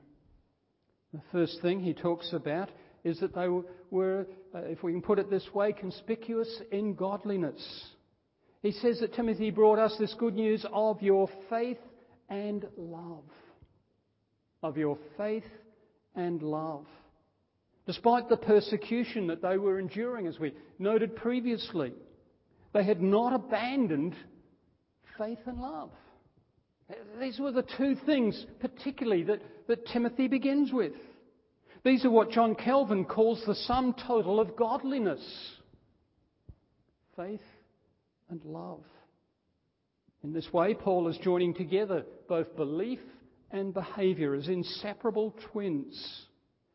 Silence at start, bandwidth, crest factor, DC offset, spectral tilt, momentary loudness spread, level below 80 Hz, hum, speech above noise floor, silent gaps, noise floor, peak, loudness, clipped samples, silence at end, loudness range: 1.15 s; 5.8 kHz; 22 dB; under 0.1%; -10 dB/octave; 16 LU; -64 dBFS; none; 48 dB; none; -78 dBFS; -10 dBFS; -31 LUFS; under 0.1%; 0.5 s; 11 LU